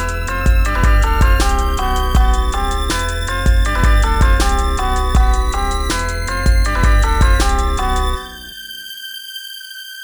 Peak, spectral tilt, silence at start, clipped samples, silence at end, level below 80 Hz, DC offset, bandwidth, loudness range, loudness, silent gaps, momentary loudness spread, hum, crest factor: 0 dBFS; -4.5 dB/octave; 0 s; under 0.1%; 0 s; -16 dBFS; 0.8%; over 20 kHz; 1 LU; -16 LUFS; none; 13 LU; none; 14 dB